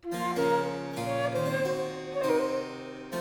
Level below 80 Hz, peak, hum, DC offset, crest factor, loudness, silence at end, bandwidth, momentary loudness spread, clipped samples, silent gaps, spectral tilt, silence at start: -64 dBFS; -14 dBFS; none; under 0.1%; 16 dB; -30 LUFS; 0 s; 20 kHz; 8 LU; under 0.1%; none; -5.5 dB/octave; 0.05 s